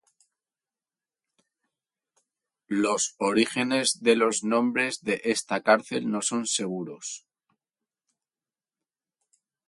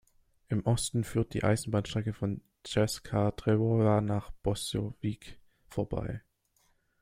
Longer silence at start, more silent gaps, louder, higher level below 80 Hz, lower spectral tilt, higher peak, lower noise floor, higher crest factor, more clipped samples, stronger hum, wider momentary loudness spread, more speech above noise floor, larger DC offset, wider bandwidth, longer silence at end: first, 2.7 s vs 0.5 s; neither; first, -25 LUFS vs -31 LUFS; second, -74 dBFS vs -52 dBFS; second, -3 dB/octave vs -6 dB/octave; first, -6 dBFS vs -12 dBFS; first, under -90 dBFS vs -71 dBFS; about the same, 24 dB vs 20 dB; neither; neither; about the same, 11 LU vs 10 LU; first, over 64 dB vs 41 dB; neither; second, 11.5 kHz vs 15.5 kHz; first, 2.5 s vs 0.85 s